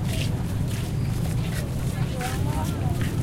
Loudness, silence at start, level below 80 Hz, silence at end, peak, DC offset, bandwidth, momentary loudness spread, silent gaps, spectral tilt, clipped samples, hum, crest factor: -27 LUFS; 0 s; -34 dBFS; 0 s; -14 dBFS; under 0.1%; 16.5 kHz; 1 LU; none; -6 dB/octave; under 0.1%; none; 12 dB